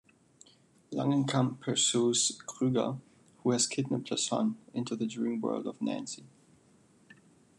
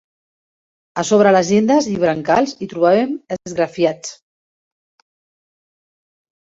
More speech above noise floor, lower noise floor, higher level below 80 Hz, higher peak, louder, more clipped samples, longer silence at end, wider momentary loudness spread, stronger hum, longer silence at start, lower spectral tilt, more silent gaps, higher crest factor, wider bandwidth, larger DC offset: second, 32 dB vs over 74 dB; second, -63 dBFS vs under -90 dBFS; second, -78 dBFS vs -58 dBFS; second, -14 dBFS vs -2 dBFS; second, -31 LUFS vs -16 LUFS; neither; second, 1.3 s vs 2.4 s; about the same, 11 LU vs 13 LU; neither; about the same, 0.9 s vs 0.95 s; about the same, -4 dB/octave vs -5 dB/octave; neither; about the same, 20 dB vs 16 dB; first, 12 kHz vs 8 kHz; neither